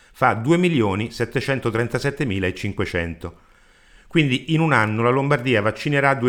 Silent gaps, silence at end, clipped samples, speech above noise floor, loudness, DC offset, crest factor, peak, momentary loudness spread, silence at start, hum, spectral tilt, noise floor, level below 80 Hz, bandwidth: none; 0 s; under 0.1%; 32 dB; -21 LUFS; under 0.1%; 18 dB; -2 dBFS; 7 LU; 0.2 s; none; -6.5 dB/octave; -52 dBFS; -48 dBFS; 16.5 kHz